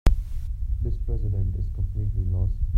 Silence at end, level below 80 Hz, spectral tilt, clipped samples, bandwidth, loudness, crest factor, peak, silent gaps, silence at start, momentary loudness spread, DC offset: 0 s; -26 dBFS; -8 dB/octave; under 0.1%; 7 kHz; -29 LUFS; 18 dB; -6 dBFS; none; 0.05 s; 5 LU; under 0.1%